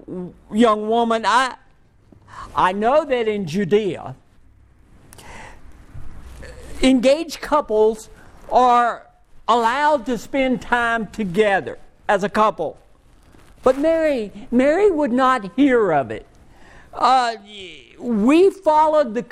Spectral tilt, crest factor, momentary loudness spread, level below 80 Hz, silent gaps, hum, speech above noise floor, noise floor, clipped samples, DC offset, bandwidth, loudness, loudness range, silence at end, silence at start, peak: -5 dB/octave; 18 dB; 18 LU; -44 dBFS; none; none; 33 dB; -51 dBFS; under 0.1%; under 0.1%; 14 kHz; -18 LUFS; 5 LU; 0.05 s; 0.1 s; -2 dBFS